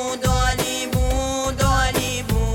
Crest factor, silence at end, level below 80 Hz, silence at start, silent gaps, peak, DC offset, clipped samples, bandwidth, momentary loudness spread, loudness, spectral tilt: 14 dB; 0 s; -26 dBFS; 0 s; none; -6 dBFS; under 0.1%; under 0.1%; 17 kHz; 4 LU; -21 LUFS; -4 dB/octave